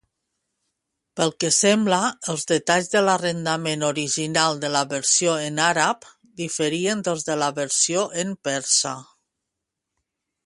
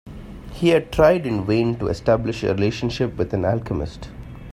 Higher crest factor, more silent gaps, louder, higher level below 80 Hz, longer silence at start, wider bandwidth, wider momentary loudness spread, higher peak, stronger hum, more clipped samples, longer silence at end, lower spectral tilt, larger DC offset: about the same, 20 dB vs 18 dB; neither; about the same, -21 LUFS vs -21 LUFS; second, -68 dBFS vs -38 dBFS; first, 1.15 s vs 0.05 s; second, 11.5 kHz vs 15.5 kHz; second, 8 LU vs 21 LU; about the same, -4 dBFS vs -4 dBFS; neither; neither; first, 1.4 s vs 0 s; second, -2.5 dB/octave vs -7 dB/octave; neither